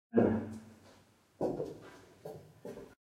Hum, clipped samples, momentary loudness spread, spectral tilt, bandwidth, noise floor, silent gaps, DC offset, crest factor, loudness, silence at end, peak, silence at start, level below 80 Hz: none; under 0.1%; 22 LU; -8.5 dB/octave; 14 kHz; -64 dBFS; none; under 0.1%; 24 dB; -35 LUFS; 0.15 s; -14 dBFS; 0.15 s; -66 dBFS